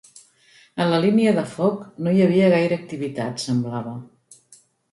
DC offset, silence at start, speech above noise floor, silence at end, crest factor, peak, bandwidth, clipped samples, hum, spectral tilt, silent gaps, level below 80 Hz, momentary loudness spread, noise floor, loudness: under 0.1%; 0.75 s; 35 dB; 0.9 s; 16 dB; -6 dBFS; 11.5 kHz; under 0.1%; none; -6.5 dB/octave; none; -64 dBFS; 13 LU; -55 dBFS; -21 LUFS